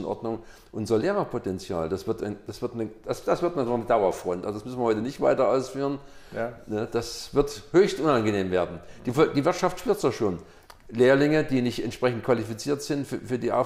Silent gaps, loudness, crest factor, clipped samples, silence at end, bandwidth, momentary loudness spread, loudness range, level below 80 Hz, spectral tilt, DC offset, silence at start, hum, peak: none; -26 LUFS; 16 dB; under 0.1%; 0 s; 16 kHz; 11 LU; 4 LU; -52 dBFS; -6 dB/octave; under 0.1%; 0 s; none; -10 dBFS